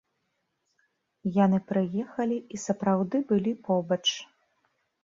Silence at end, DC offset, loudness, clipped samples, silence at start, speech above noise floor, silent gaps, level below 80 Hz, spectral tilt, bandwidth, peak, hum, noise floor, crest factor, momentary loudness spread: 0.8 s; under 0.1%; -27 LUFS; under 0.1%; 1.25 s; 51 dB; none; -70 dBFS; -5.5 dB/octave; 7.8 kHz; -12 dBFS; none; -78 dBFS; 18 dB; 8 LU